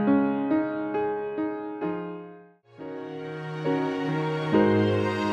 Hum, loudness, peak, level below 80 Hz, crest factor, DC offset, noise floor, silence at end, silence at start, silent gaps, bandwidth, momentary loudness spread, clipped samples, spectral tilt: none; -27 LUFS; -10 dBFS; -64 dBFS; 16 dB; under 0.1%; -50 dBFS; 0 s; 0 s; none; 8.6 kHz; 15 LU; under 0.1%; -8 dB/octave